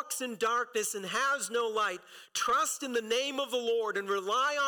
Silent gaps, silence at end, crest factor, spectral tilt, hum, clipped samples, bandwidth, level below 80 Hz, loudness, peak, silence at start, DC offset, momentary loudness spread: none; 0 s; 10 dB; -1 dB/octave; none; under 0.1%; 19 kHz; -76 dBFS; -31 LUFS; -22 dBFS; 0 s; under 0.1%; 5 LU